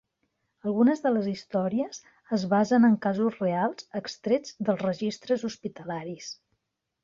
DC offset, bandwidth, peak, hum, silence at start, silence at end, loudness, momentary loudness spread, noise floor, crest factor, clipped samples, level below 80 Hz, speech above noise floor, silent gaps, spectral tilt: under 0.1%; 7.4 kHz; -12 dBFS; none; 0.65 s; 0.7 s; -27 LUFS; 14 LU; -79 dBFS; 16 dB; under 0.1%; -70 dBFS; 53 dB; none; -6.5 dB/octave